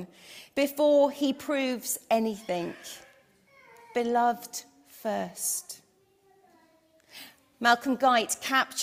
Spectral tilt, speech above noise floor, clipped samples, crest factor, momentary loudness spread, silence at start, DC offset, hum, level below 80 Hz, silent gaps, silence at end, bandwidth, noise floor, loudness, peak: -2.5 dB/octave; 37 dB; under 0.1%; 22 dB; 21 LU; 0 s; under 0.1%; none; -74 dBFS; none; 0 s; 16 kHz; -65 dBFS; -27 LUFS; -6 dBFS